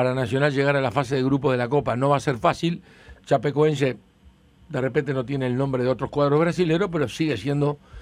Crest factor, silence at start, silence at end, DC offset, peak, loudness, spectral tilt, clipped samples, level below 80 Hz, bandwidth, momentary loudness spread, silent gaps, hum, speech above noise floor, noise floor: 16 dB; 0 s; 0 s; under 0.1%; -6 dBFS; -23 LUFS; -7 dB/octave; under 0.1%; -52 dBFS; 11.5 kHz; 6 LU; none; none; 32 dB; -54 dBFS